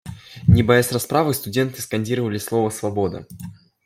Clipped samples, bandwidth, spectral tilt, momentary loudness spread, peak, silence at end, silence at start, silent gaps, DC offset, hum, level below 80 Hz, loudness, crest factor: under 0.1%; 16.5 kHz; -6 dB/octave; 20 LU; -2 dBFS; 0.35 s; 0.05 s; none; under 0.1%; none; -42 dBFS; -20 LUFS; 18 dB